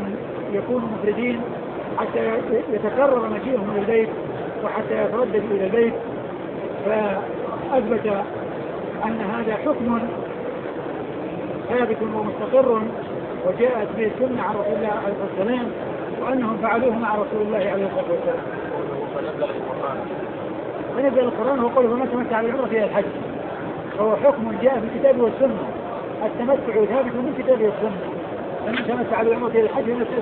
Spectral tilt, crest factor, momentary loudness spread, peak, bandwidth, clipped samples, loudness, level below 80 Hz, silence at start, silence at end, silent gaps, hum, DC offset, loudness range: -11 dB/octave; 18 dB; 10 LU; -4 dBFS; 4.3 kHz; under 0.1%; -23 LUFS; -56 dBFS; 0 s; 0 s; none; none; under 0.1%; 4 LU